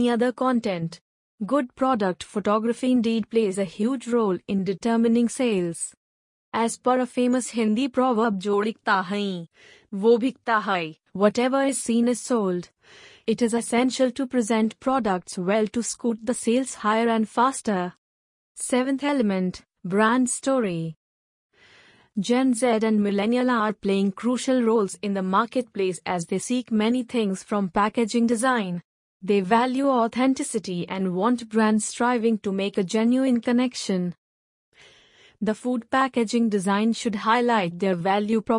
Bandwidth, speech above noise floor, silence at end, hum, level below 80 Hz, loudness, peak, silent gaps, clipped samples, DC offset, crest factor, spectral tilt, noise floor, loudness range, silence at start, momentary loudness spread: 11 kHz; 33 dB; 0 s; none; -64 dBFS; -24 LUFS; -6 dBFS; 1.01-1.38 s, 5.97-6.52 s, 17.98-18.55 s, 20.96-21.49 s, 28.84-29.20 s, 34.18-34.72 s; under 0.1%; under 0.1%; 18 dB; -5 dB/octave; -55 dBFS; 2 LU; 0 s; 7 LU